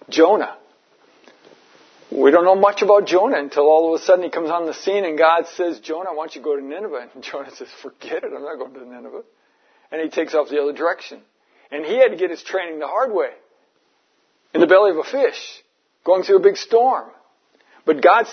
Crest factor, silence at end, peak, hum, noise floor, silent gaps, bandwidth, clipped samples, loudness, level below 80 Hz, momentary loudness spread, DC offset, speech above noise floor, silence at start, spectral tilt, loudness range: 18 dB; 0 s; 0 dBFS; none; -64 dBFS; none; 6.6 kHz; under 0.1%; -18 LUFS; -78 dBFS; 19 LU; under 0.1%; 46 dB; 0.1 s; -4 dB/octave; 12 LU